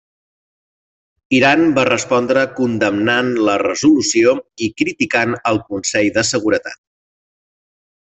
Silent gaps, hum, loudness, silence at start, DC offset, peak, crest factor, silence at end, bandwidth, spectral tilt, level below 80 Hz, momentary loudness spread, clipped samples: none; none; -15 LUFS; 1.3 s; under 0.1%; 0 dBFS; 16 dB; 1.25 s; 8.4 kHz; -4 dB/octave; -56 dBFS; 7 LU; under 0.1%